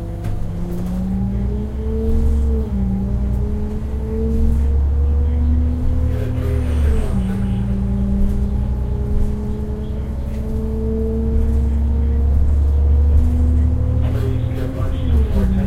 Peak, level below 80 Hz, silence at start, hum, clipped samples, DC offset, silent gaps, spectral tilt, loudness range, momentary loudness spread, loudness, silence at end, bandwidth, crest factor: -4 dBFS; -18 dBFS; 0 s; none; under 0.1%; under 0.1%; none; -9.5 dB/octave; 4 LU; 8 LU; -20 LUFS; 0 s; 4.2 kHz; 12 dB